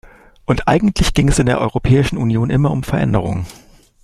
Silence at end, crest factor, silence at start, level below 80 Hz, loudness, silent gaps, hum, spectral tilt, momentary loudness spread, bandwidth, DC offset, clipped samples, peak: 0.5 s; 14 dB; 0.5 s; -28 dBFS; -16 LUFS; none; none; -6 dB/octave; 8 LU; 13 kHz; under 0.1%; under 0.1%; -2 dBFS